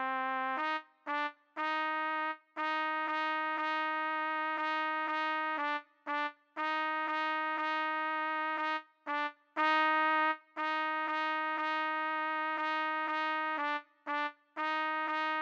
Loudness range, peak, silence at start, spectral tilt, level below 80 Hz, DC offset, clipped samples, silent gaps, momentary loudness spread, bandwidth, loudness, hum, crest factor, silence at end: 2 LU; -18 dBFS; 0 s; -1.5 dB/octave; under -90 dBFS; under 0.1%; under 0.1%; none; 6 LU; 7.6 kHz; -34 LUFS; none; 16 dB; 0 s